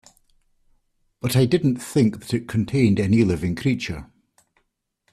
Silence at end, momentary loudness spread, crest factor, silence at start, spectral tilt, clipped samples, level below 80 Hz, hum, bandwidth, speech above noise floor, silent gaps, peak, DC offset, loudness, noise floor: 1.1 s; 9 LU; 18 dB; 1.25 s; -6.5 dB/octave; under 0.1%; -50 dBFS; none; 14.5 kHz; 52 dB; none; -6 dBFS; under 0.1%; -21 LUFS; -73 dBFS